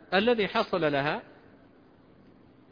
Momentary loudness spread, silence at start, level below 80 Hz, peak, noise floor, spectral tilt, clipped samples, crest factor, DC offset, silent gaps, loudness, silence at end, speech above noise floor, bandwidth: 7 LU; 0.1 s; -64 dBFS; -10 dBFS; -57 dBFS; -7 dB/octave; under 0.1%; 20 dB; under 0.1%; none; -27 LUFS; 1.5 s; 31 dB; 5.2 kHz